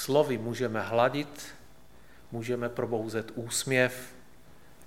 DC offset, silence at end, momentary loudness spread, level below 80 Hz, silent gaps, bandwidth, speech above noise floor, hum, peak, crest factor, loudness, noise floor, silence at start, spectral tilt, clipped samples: 0.3%; 0 s; 16 LU; -62 dBFS; none; 17 kHz; 27 dB; none; -10 dBFS; 22 dB; -30 LUFS; -56 dBFS; 0 s; -4.5 dB/octave; under 0.1%